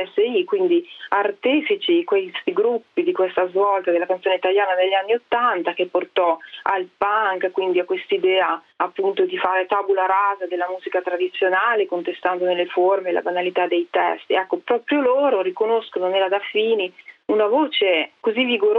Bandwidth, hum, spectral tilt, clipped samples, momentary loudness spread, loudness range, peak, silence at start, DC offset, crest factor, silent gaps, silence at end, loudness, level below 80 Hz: 4.5 kHz; none; -6.5 dB/octave; under 0.1%; 5 LU; 1 LU; -4 dBFS; 0 s; under 0.1%; 16 dB; none; 0 s; -20 LUFS; -72 dBFS